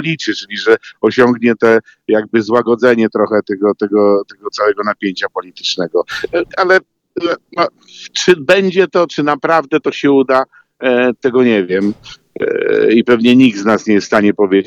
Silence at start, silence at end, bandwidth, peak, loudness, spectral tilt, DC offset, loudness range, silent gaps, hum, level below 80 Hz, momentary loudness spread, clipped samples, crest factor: 0 s; 0.05 s; 9.2 kHz; 0 dBFS; -13 LUFS; -5 dB/octave; under 0.1%; 4 LU; none; none; -56 dBFS; 9 LU; under 0.1%; 12 dB